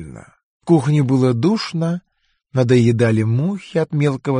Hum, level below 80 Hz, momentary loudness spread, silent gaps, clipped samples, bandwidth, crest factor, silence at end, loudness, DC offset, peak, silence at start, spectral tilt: none; -54 dBFS; 10 LU; 0.43-0.60 s; under 0.1%; 10 kHz; 16 dB; 0 s; -17 LUFS; under 0.1%; -2 dBFS; 0 s; -7.5 dB/octave